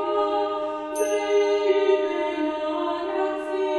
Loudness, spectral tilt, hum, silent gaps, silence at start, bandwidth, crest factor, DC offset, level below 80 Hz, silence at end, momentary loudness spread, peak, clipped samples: -24 LUFS; -2.5 dB/octave; none; none; 0 s; 12 kHz; 14 dB; under 0.1%; -62 dBFS; 0 s; 6 LU; -10 dBFS; under 0.1%